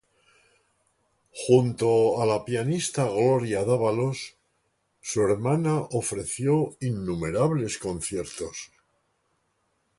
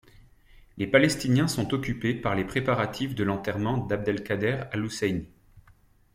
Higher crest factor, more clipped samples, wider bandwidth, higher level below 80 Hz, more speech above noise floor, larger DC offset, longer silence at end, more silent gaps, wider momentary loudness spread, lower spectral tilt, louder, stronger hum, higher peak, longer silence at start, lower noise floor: about the same, 22 dB vs 22 dB; neither; second, 11.5 kHz vs 16 kHz; about the same, -56 dBFS vs -52 dBFS; first, 48 dB vs 32 dB; neither; first, 1.35 s vs 0.55 s; neither; first, 13 LU vs 7 LU; about the same, -6 dB/octave vs -5.5 dB/octave; about the same, -25 LUFS vs -27 LUFS; neither; about the same, -6 dBFS vs -4 dBFS; first, 1.35 s vs 0.75 s; first, -73 dBFS vs -59 dBFS